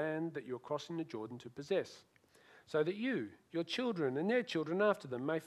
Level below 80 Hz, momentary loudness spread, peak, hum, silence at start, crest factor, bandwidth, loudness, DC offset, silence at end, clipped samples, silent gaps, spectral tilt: -84 dBFS; 11 LU; -18 dBFS; none; 0 s; 20 dB; 13 kHz; -38 LUFS; under 0.1%; 0 s; under 0.1%; none; -6 dB/octave